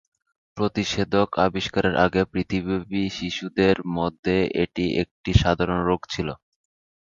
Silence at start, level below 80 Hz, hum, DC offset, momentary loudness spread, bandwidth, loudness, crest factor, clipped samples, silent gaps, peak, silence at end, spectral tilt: 0.55 s; -40 dBFS; none; under 0.1%; 7 LU; 7.6 kHz; -23 LUFS; 20 dB; under 0.1%; 4.19-4.23 s, 5.11-5.24 s; -2 dBFS; 0.7 s; -6 dB/octave